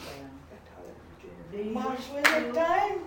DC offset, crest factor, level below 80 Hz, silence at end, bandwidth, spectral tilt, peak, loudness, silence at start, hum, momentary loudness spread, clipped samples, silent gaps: under 0.1%; 26 dB; -58 dBFS; 0 s; 17.5 kHz; -3.5 dB/octave; -4 dBFS; -27 LUFS; 0 s; none; 24 LU; under 0.1%; none